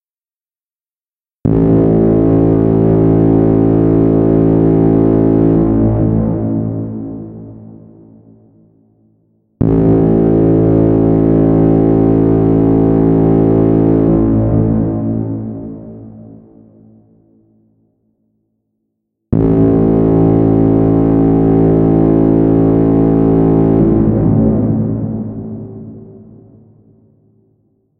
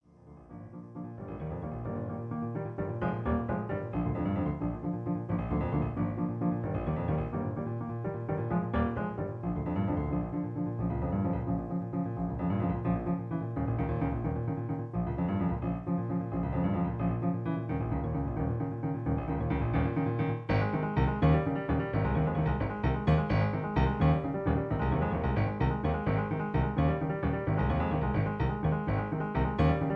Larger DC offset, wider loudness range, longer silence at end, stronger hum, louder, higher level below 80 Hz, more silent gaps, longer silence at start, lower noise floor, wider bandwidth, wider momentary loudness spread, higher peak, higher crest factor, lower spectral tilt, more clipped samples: neither; first, 11 LU vs 4 LU; first, 1.9 s vs 0 s; neither; first, -11 LUFS vs -32 LUFS; first, -28 dBFS vs -40 dBFS; neither; first, 1.45 s vs 0.25 s; first, under -90 dBFS vs -54 dBFS; second, 3.1 kHz vs 5.6 kHz; first, 12 LU vs 7 LU; first, 0 dBFS vs -12 dBFS; second, 12 dB vs 18 dB; first, -13.5 dB/octave vs -10.5 dB/octave; neither